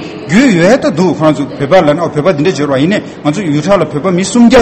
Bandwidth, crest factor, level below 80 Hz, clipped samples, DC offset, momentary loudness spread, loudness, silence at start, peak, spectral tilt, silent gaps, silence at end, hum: 9.2 kHz; 8 dB; -40 dBFS; 1%; under 0.1%; 6 LU; -10 LUFS; 0 s; 0 dBFS; -6 dB/octave; none; 0 s; none